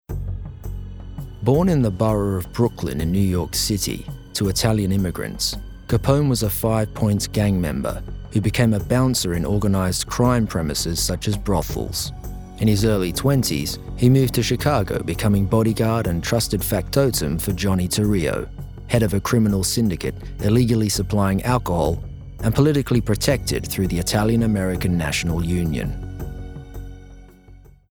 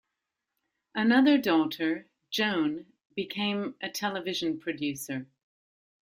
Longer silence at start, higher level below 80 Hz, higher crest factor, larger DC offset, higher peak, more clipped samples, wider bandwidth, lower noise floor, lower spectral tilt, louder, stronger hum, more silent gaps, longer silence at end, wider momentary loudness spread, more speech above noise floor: second, 0.1 s vs 0.95 s; first, -34 dBFS vs -72 dBFS; about the same, 20 dB vs 20 dB; first, 0.1% vs under 0.1%; first, -2 dBFS vs -10 dBFS; neither; first, over 20 kHz vs 16 kHz; second, -46 dBFS vs -85 dBFS; about the same, -5.5 dB/octave vs -4.5 dB/octave; first, -21 LUFS vs -29 LUFS; neither; neither; second, 0.35 s vs 0.75 s; second, 12 LU vs 15 LU; second, 26 dB vs 58 dB